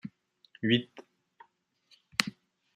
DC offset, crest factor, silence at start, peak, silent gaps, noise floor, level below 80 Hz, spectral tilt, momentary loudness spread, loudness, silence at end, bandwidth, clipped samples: under 0.1%; 32 dB; 0.05 s; -4 dBFS; none; -70 dBFS; -74 dBFS; -4 dB/octave; 19 LU; -31 LUFS; 0.45 s; 13 kHz; under 0.1%